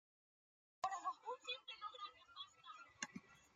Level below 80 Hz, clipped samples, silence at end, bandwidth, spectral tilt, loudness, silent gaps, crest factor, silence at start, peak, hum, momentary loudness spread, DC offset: under -90 dBFS; under 0.1%; 0.05 s; 12.5 kHz; -1.5 dB/octave; -50 LUFS; none; 26 dB; 0.85 s; -26 dBFS; none; 11 LU; under 0.1%